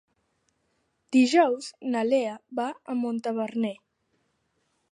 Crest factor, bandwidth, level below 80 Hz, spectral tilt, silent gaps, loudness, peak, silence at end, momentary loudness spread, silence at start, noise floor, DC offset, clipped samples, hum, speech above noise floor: 18 dB; 10.5 kHz; -84 dBFS; -4.5 dB/octave; none; -26 LUFS; -8 dBFS; 1.15 s; 11 LU; 1.1 s; -74 dBFS; under 0.1%; under 0.1%; none; 48 dB